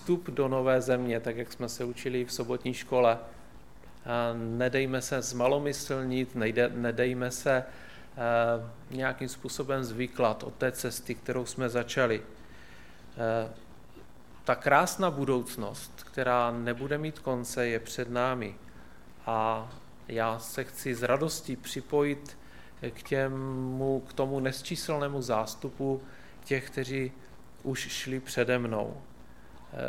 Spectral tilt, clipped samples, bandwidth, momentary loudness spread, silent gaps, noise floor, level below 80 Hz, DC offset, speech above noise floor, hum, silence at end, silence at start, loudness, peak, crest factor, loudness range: -5 dB/octave; under 0.1%; 17 kHz; 13 LU; none; -53 dBFS; -58 dBFS; 0.4%; 22 dB; none; 0 s; 0 s; -31 LUFS; -8 dBFS; 24 dB; 4 LU